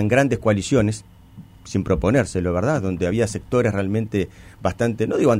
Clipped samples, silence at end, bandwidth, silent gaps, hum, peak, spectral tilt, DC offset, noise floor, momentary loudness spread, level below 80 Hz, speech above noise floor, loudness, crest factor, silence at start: under 0.1%; 0 s; 14.5 kHz; none; none; -6 dBFS; -6.5 dB/octave; under 0.1%; -44 dBFS; 8 LU; -40 dBFS; 24 dB; -21 LUFS; 14 dB; 0 s